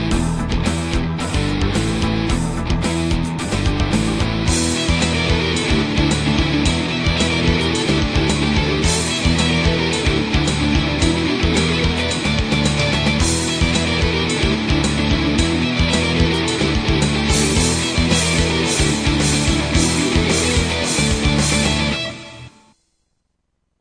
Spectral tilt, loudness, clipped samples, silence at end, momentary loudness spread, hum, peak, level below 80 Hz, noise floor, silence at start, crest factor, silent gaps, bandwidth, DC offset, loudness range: -4.5 dB/octave; -17 LUFS; under 0.1%; 1.3 s; 4 LU; none; -2 dBFS; -26 dBFS; -70 dBFS; 0 s; 16 dB; none; 10.5 kHz; 0.2%; 3 LU